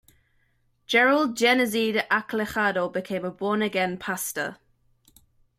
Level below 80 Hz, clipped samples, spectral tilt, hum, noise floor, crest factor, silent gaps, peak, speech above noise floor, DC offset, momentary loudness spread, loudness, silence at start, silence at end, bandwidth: -64 dBFS; under 0.1%; -3.5 dB/octave; none; -67 dBFS; 18 dB; none; -8 dBFS; 43 dB; under 0.1%; 9 LU; -24 LUFS; 0.9 s; 1.05 s; 16 kHz